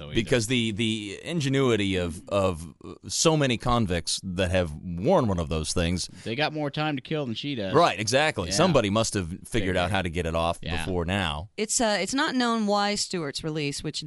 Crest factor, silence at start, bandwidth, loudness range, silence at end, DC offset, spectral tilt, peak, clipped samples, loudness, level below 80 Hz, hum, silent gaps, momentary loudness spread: 20 dB; 0 s; 11.5 kHz; 2 LU; 0 s; under 0.1%; -4.5 dB/octave; -6 dBFS; under 0.1%; -26 LUFS; -44 dBFS; none; none; 9 LU